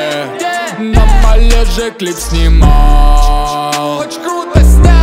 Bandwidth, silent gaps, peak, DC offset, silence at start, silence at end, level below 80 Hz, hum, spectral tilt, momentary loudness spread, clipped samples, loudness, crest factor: 15 kHz; none; 0 dBFS; under 0.1%; 0 s; 0 s; -8 dBFS; none; -5.5 dB/octave; 9 LU; 1%; -11 LUFS; 8 dB